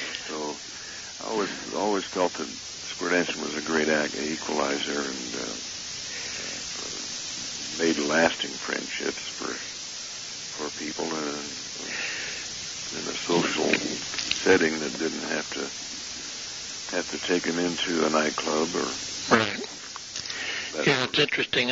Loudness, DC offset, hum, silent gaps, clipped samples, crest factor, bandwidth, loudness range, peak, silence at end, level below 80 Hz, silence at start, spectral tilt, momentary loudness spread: -27 LUFS; under 0.1%; none; none; under 0.1%; 24 dB; 8 kHz; 5 LU; -4 dBFS; 0 s; -62 dBFS; 0 s; -2.5 dB/octave; 11 LU